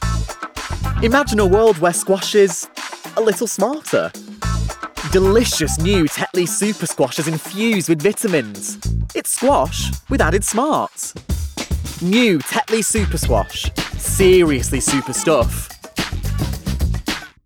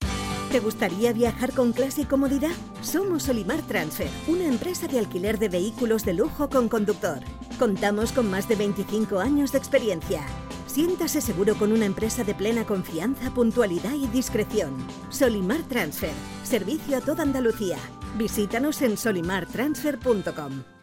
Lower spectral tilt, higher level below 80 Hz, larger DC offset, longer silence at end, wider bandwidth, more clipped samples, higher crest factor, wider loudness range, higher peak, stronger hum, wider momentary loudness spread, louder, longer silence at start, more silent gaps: about the same, -4.5 dB/octave vs -5 dB/octave; first, -28 dBFS vs -44 dBFS; neither; about the same, 0.15 s vs 0.1 s; about the same, 18.5 kHz vs 17 kHz; neither; about the same, 14 dB vs 18 dB; about the same, 3 LU vs 2 LU; first, -4 dBFS vs -8 dBFS; neither; first, 11 LU vs 7 LU; first, -18 LUFS vs -25 LUFS; about the same, 0 s vs 0 s; neither